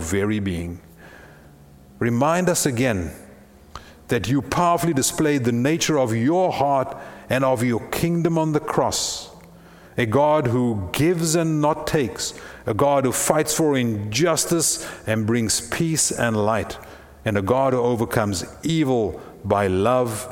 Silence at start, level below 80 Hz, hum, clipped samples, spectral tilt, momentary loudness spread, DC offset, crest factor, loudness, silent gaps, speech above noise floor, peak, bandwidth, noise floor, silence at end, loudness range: 0 s; -48 dBFS; none; under 0.1%; -4.5 dB/octave; 9 LU; under 0.1%; 20 dB; -21 LUFS; none; 26 dB; -2 dBFS; 18.5 kHz; -47 dBFS; 0 s; 3 LU